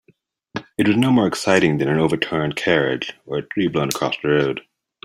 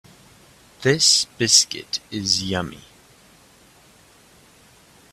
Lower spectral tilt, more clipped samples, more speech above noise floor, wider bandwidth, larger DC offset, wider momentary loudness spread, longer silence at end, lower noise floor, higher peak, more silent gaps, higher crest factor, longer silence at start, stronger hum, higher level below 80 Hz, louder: first, -5.5 dB/octave vs -2 dB/octave; neither; first, 41 dB vs 32 dB; about the same, 16 kHz vs 16 kHz; neither; about the same, 11 LU vs 13 LU; second, 0.45 s vs 2.35 s; first, -60 dBFS vs -52 dBFS; about the same, -2 dBFS vs 0 dBFS; neither; second, 18 dB vs 24 dB; second, 0.55 s vs 0.8 s; neither; about the same, -54 dBFS vs -58 dBFS; about the same, -19 LUFS vs -18 LUFS